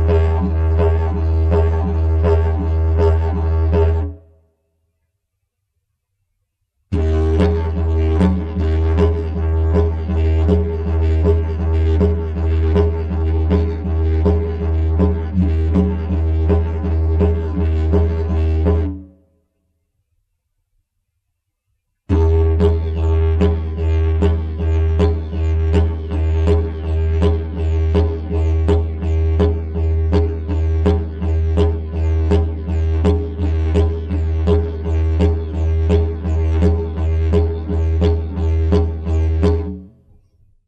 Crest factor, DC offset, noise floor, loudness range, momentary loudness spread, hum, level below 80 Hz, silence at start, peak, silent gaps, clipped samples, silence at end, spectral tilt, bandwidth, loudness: 14 dB; under 0.1%; -73 dBFS; 4 LU; 5 LU; none; -20 dBFS; 0 s; -2 dBFS; none; under 0.1%; 0.8 s; -9.5 dB/octave; 5 kHz; -18 LUFS